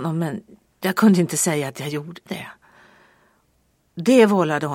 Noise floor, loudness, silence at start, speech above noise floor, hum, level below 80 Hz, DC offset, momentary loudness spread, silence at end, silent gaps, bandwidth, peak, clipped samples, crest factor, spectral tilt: -64 dBFS; -19 LUFS; 0 s; 45 dB; none; -68 dBFS; under 0.1%; 18 LU; 0 s; none; 16.5 kHz; -2 dBFS; under 0.1%; 20 dB; -5 dB/octave